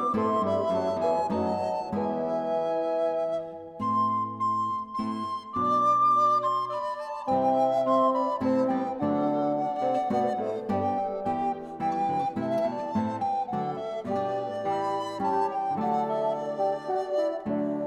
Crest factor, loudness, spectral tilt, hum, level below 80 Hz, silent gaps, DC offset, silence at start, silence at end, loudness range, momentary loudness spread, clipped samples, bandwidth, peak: 14 dB; -27 LUFS; -7.5 dB/octave; none; -66 dBFS; none; under 0.1%; 0 s; 0 s; 4 LU; 8 LU; under 0.1%; 11.5 kHz; -12 dBFS